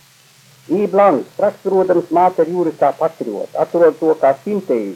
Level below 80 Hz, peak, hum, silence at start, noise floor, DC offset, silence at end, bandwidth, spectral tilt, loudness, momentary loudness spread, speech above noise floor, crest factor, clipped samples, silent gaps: -68 dBFS; -2 dBFS; none; 0.7 s; -48 dBFS; under 0.1%; 0 s; 14.5 kHz; -7.5 dB/octave; -16 LUFS; 8 LU; 33 dB; 14 dB; under 0.1%; none